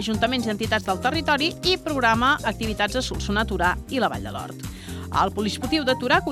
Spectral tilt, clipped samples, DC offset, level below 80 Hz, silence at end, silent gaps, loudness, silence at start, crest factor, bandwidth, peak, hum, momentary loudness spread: -4.5 dB/octave; under 0.1%; under 0.1%; -38 dBFS; 0 s; none; -23 LUFS; 0 s; 20 dB; 16 kHz; -4 dBFS; none; 11 LU